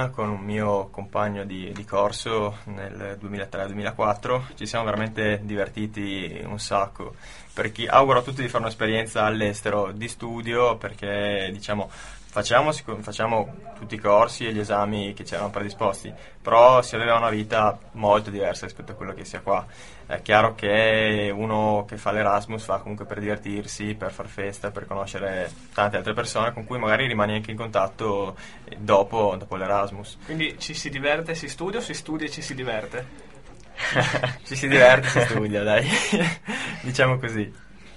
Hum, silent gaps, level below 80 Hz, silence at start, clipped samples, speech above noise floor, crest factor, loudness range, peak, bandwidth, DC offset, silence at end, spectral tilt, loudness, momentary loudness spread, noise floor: none; none; -50 dBFS; 0 s; under 0.1%; 23 dB; 24 dB; 8 LU; 0 dBFS; 11.5 kHz; 0.5%; 0 s; -5 dB/octave; -24 LUFS; 14 LU; -47 dBFS